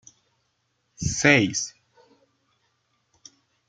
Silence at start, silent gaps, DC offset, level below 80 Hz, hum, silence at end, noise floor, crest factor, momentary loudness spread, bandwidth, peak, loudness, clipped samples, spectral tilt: 1 s; none; under 0.1%; -54 dBFS; none; 2 s; -73 dBFS; 26 dB; 14 LU; 9.6 kHz; -2 dBFS; -22 LUFS; under 0.1%; -3.5 dB/octave